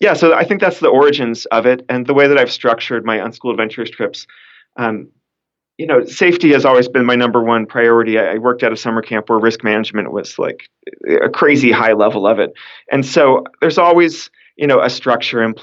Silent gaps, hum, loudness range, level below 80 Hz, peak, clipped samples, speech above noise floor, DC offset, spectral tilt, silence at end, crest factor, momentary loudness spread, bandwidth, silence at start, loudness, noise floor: none; none; 5 LU; -64 dBFS; 0 dBFS; under 0.1%; 67 dB; under 0.1%; -5.5 dB/octave; 0.05 s; 14 dB; 11 LU; 7.8 kHz; 0 s; -13 LUFS; -80 dBFS